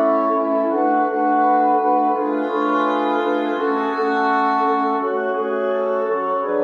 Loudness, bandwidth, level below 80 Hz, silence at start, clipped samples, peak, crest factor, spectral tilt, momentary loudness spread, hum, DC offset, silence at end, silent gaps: -19 LUFS; 7 kHz; -72 dBFS; 0 s; under 0.1%; -6 dBFS; 12 dB; -6.5 dB/octave; 4 LU; none; under 0.1%; 0 s; none